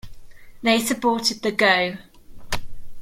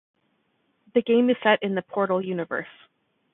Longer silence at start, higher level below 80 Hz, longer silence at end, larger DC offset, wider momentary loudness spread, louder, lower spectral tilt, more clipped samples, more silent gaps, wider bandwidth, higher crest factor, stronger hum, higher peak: second, 0.05 s vs 0.95 s; first, -42 dBFS vs -74 dBFS; second, 0 s vs 0.65 s; neither; first, 14 LU vs 11 LU; first, -21 LUFS vs -24 LUFS; second, -3 dB/octave vs -10 dB/octave; neither; neither; first, 16.5 kHz vs 4 kHz; about the same, 18 dB vs 20 dB; neither; about the same, -4 dBFS vs -6 dBFS